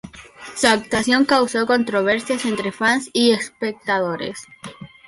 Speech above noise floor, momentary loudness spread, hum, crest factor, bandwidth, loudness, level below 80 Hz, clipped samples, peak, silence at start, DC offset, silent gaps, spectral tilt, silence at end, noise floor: 20 dB; 19 LU; none; 16 dB; 11.5 kHz; -19 LUFS; -54 dBFS; under 0.1%; -4 dBFS; 0.05 s; under 0.1%; none; -3.5 dB/octave; 0.2 s; -40 dBFS